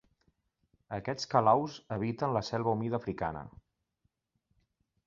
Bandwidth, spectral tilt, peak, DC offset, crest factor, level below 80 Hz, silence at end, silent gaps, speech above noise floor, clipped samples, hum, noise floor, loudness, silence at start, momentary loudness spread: 7.2 kHz; -5.5 dB/octave; -10 dBFS; under 0.1%; 24 dB; -62 dBFS; 1.55 s; none; 48 dB; under 0.1%; none; -80 dBFS; -32 LUFS; 0.9 s; 14 LU